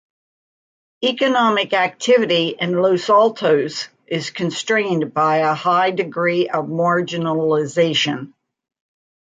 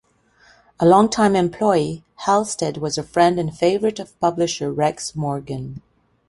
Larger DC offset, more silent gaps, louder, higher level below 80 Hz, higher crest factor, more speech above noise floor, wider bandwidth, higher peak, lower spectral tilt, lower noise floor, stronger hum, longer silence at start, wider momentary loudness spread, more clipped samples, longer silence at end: neither; neither; about the same, -18 LUFS vs -19 LUFS; second, -68 dBFS vs -54 dBFS; about the same, 16 dB vs 18 dB; first, over 72 dB vs 36 dB; second, 9.4 kHz vs 11.5 kHz; about the same, -2 dBFS vs -2 dBFS; about the same, -4.5 dB/octave vs -5.5 dB/octave; first, under -90 dBFS vs -55 dBFS; neither; first, 1 s vs 0.8 s; second, 8 LU vs 12 LU; neither; first, 1.05 s vs 0.5 s